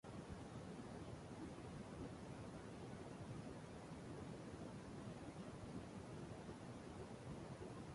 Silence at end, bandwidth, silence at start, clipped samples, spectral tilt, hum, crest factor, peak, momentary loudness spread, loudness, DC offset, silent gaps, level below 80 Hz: 0 s; 11.5 kHz; 0.05 s; under 0.1%; -6.5 dB/octave; none; 14 dB; -40 dBFS; 1 LU; -54 LUFS; under 0.1%; none; -66 dBFS